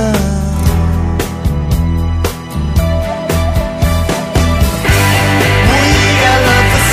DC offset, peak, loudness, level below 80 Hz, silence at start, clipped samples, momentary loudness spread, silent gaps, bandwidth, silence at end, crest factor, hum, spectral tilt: under 0.1%; 0 dBFS; -12 LUFS; -18 dBFS; 0 s; under 0.1%; 8 LU; none; 15.5 kHz; 0 s; 12 dB; none; -5 dB/octave